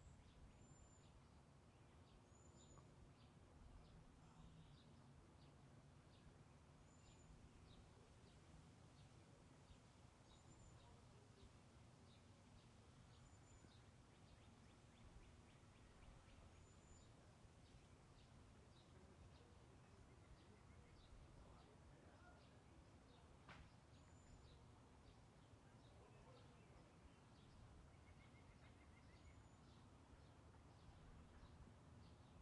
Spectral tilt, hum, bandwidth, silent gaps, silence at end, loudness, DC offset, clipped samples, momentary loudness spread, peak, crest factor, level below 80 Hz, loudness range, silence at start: -5 dB/octave; none; 10.5 kHz; none; 0 s; -68 LUFS; under 0.1%; under 0.1%; 2 LU; -50 dBFS; 18 dB; -74 dBFS; 1 LU; 0 s